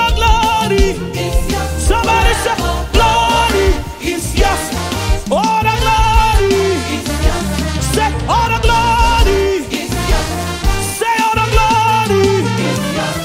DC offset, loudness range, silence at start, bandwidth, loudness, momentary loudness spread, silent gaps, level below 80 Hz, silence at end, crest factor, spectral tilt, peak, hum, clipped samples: under 0.1%; 0 LU; 0 s; 16.5 kHz; -14 LUFS; 6 LU; none; -18 dBFS; 0 s; 14 dB; -4.5 dB/octave; 0 dBFS; none; under 0.1%